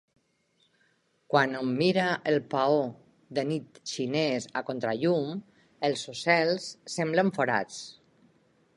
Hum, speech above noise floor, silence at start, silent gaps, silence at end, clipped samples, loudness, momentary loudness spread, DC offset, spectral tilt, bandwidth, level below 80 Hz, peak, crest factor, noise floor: none; 43 dB; 1.3 s; none; 0.85 s; under 0.1%; -28 LUFS; 11 LU; under 0.1%; -5 dB/octave; 11.5 kHz; -74 dBFS; -8 dBFS; 22 dB; -70 dBFS